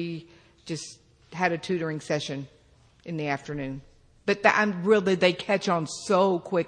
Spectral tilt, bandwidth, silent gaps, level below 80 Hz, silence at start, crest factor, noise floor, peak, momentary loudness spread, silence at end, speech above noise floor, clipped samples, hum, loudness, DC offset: -5 dB/octave; 10 kHz; none; -60 dBFS; 0 s; 22 dB; -56 dBFS; -4 dBFS; 17 LU; 0 s; 30 dB; under 0.1%; none; -26 LUFS; under 0.1%